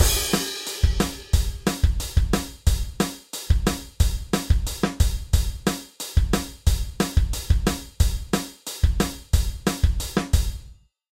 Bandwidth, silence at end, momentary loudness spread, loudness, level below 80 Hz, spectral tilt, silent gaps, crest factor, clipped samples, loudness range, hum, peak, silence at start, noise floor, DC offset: 16.5 kHz; 0.45 s; 4 LU; -25 LUFS; -24 dBFS; -4.5 dB/octave; none; 18 dB; under 0.1%; 1 LU; none; -4 dBFS; 0 s; -47 dBFS; under 0.1%